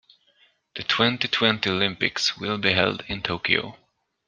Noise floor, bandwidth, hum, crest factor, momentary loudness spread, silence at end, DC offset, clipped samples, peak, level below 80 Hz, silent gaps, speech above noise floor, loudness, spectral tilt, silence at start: -62 dBFS; 10 kHz; none; 24 dB; 8 LU; 0.5 s; under 0.1%; under 0.1%; -2 dBFS; -56 dBFS; none; 38 dB; -23 LUFS; -4 dB/octave; 0.75 s